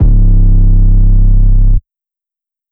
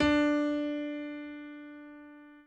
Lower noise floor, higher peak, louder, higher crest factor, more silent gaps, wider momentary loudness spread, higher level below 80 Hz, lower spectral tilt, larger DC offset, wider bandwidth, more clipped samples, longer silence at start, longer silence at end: first, -87 dBFS vs -52 dBFS; first, 0 dBFS vs -16 dBFS; first, -11 LUFS vs -32 LUFS; second, 6 dB vs 16 dB; neither; second, 3 LU vs 23 LU; first, -6 dBFS vs -56 dBFS; first, -13.5 dB/octave vs -5.5 dB/octave; neither; second, 0.9 kHz vs 8.2 kHz; neither; about the same, 0 s vs 0 s; first, 0.95 s vs 0.05 s